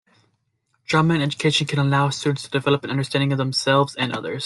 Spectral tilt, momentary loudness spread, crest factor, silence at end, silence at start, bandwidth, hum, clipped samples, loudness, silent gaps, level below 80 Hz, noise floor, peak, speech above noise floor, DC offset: -5.5 dB/octave; 5 LU; 16 dB; 0 s; 0.9 s; 11.5 kHz; none; under 0.1%; -21 LUFS; none; -60 dBFS; -70 dBFS; -4 dBFS; 49 dB; under 0.1%